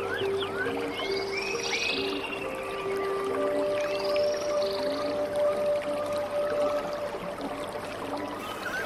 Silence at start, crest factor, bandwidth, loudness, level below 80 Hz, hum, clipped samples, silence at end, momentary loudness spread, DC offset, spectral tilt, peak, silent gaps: 0 s; 14 dB; 15 kHz; -30 LUFS; -58 dBFS; none; under 0.1%; 0 s; 7 LU; under 0.1%; -3.5 dB/octave; -16 dBFS; none